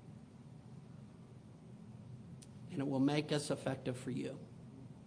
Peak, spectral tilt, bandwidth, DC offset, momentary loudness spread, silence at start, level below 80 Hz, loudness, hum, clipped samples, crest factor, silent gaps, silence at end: -20 dBFS; -6 dB/octave; 10.5 kHz; under 0.1%; 22 LU; 0 s; -72 dBFS; -39 LUFS; none; under 0.1%; 22 dB; none; 0 s